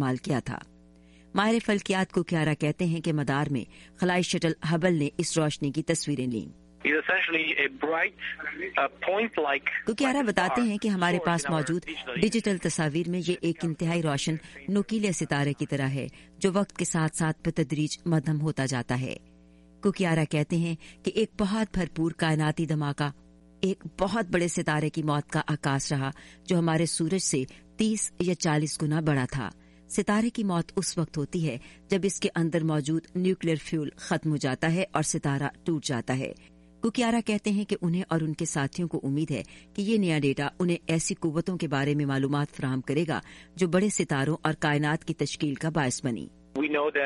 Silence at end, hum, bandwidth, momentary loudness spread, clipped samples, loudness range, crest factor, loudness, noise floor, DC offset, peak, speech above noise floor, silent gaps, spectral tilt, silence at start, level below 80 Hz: 0 s; none; 11.5 kHz; 6 LU; under 0.1%; 2 LU; 22 dB; -28 LUFS; -55 dBFS; under 0.1%; -6 dBFS; 27 dB; none; -5 dB/octave; 0 s; -56 dBFS